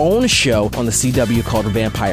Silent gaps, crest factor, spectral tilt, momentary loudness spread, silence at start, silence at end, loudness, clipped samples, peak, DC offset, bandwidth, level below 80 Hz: none; 12 dB; -4 dB/octave; 5 LU; 0 s; 0 s; -15 LUFS; under 0.1%; -2 dBFS; under 0.1%; 16 kHz; -30 dBFS